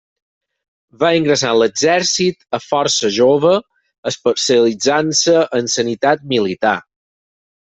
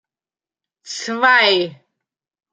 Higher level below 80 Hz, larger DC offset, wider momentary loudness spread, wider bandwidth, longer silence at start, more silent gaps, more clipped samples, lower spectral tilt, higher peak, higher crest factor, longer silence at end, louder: first, -58 dBFS vs -74 dBFS; neither; second, 6 LU vs 16 LU; second, 8.4 kHz vs 9.4 kHz; first, 1 s vs 0.85 s; first, 3.98-4.03 s vs none; neither; about the same, -3 dB/octave vs -2 dB/octave; about the same, 0 dBFS vs -2 dBFS; about the same, 16 dB vs 20 dB; first, 0.95 s vs 0.8 s; about the same, -15 LUFS vs -14 LUFS